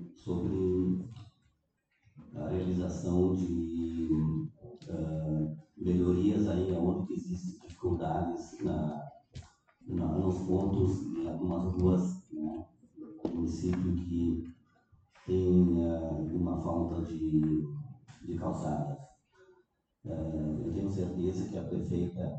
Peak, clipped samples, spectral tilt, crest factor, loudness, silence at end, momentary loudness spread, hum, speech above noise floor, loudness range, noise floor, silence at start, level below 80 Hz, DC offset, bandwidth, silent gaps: -14 dBFS; under 0.1%; -9 dB/octave; 18 dB; -33 LUFS; 0 s; 15 LU; none; 45 dB; 5 LU; -77 dBFS; 0 s; -52 dBFS; under 0.1%; 8.4 kHz; none